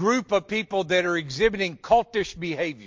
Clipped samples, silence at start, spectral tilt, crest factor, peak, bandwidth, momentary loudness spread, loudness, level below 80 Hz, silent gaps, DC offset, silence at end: under 0.1%; 0 s; -4.5 dB/octave; 18 dB; -6 dBFS; 7.6 kHz; 7 LU; -24 LUFS; -52 dBFS; none; under 0.1%; 0 s